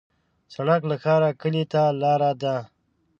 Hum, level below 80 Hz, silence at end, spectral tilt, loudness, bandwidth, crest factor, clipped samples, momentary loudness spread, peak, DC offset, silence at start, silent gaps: none; -68 dBFS; 0.55 s; -8 dB/octave; -23 LUFS; 7.2 kHz; 18 dB; under 0.1%; 8 LU; -6 dBFS; under 0.1%; 0.5 s; none